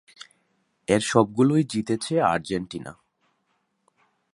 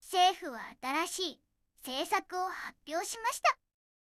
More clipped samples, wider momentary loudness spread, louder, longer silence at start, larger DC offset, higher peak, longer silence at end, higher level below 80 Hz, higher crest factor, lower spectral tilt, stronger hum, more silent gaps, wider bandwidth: neither; first, 17 LU vs 14 LU; first, -23 LUFS vs -33 LUFS; first, 0.9 s vs 0.05 s; neither; first, -4 dBFS vs -14 dBFS; first, 1.45 s vs 0.5 s; first, -58 dBFS vs -74 dBFS; about the same, 22 dB vs 20 dB; first, -5.5 dB/octave vs 0 dB/octave; neither; neither; second, 11.5 kHz vs 16 kHz